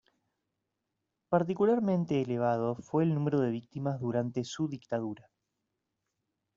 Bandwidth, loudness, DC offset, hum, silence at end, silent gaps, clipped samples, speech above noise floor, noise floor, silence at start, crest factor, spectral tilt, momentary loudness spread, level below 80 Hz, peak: 7.6 kHz; -31 LUFS; under 0.1%; none; 1.4 s; none; under 0.1%; 55 dB; -85 dBFS; 1.3 s; 20 dB; -7.5 dB/octave; 8 LU; -72 dBFS; -12 dBFS